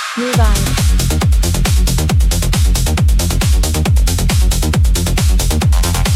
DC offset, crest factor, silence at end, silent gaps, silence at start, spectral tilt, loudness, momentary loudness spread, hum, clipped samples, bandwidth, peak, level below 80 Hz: under 0.1%; 10 dB; 0 s; none; 0 s; -4.5 dB/octave; -14 LUFS; 1 LU; none; under 0.1%; 16 kHz; 0 dBFS; -14 dBFS